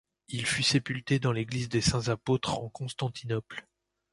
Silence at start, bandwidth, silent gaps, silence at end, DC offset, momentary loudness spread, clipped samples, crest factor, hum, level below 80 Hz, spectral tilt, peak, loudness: 0.3 s; 11.5 kHz; none; 0.5 s; under 0.1%; 10 LU; under 0.1%; 18 dB; none; -54 dBFS; -4.5 dB/octave; -12 dBFS; -30 LUFS